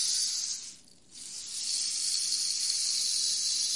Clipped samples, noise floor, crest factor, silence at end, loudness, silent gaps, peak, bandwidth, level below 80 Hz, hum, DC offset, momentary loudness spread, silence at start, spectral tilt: under 0.1%; -52 dBFS; 18 dB; 0 s; -28 LUFS; none; -14 dBFS; 11.5 kHz; -76 dBFS; none; under 0.1%; 13 LU; 0 s; 4 dB/octave